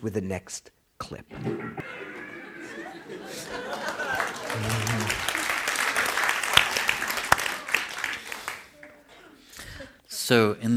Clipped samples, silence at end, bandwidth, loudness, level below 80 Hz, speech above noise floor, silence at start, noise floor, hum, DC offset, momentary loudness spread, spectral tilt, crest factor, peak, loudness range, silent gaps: under 0.1%; 0 s; over 20 kHz; -26 LUFS; -54 dBFS; 24 dB; 0 s; -52 dBFS; none; under 0.1%; 18 LU; -3 dB/octave; 26 dB; -2 dBFS; 12 LU; none